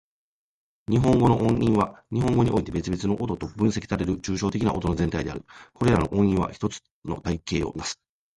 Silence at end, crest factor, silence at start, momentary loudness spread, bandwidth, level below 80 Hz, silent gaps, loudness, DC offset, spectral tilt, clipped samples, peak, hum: 0.4 s; 18 dB; 0.9 s; 12 LU; 11.5 kHz; -42 dBFS; 6.91-7.02 s; -25 LUFS; under 0.1%; -7 dB/octave; under 0.1%; -6 dBFS; none